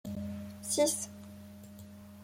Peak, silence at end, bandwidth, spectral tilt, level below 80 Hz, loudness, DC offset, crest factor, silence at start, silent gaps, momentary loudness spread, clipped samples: -16 dBFS; 0 s; 16.5 kHz; -3.5 dB/octave; -68 dBFS; -33 LUFS; under 0.1%; 22 dB; 0.05 s; none; 21 LU; under 0.1%